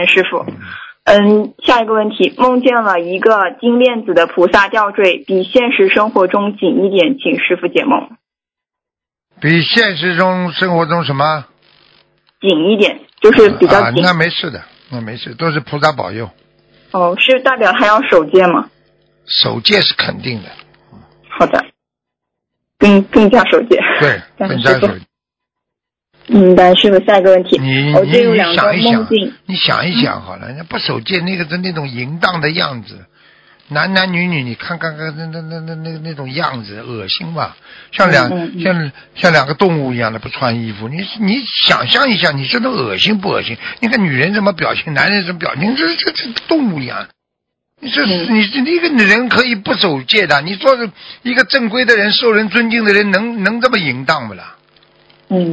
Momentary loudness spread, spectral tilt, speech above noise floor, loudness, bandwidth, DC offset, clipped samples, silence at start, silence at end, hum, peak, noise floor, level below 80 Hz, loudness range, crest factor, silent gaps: 13 LU; -6 dB/octave; 74 dB; -12 LUFS; 8 kHz; under 0.1%; 0.6%; 0 s; 0 s; none; 0 dBFS; -86 dBFS; -48 dBFS; 6 LU; 14 dB; none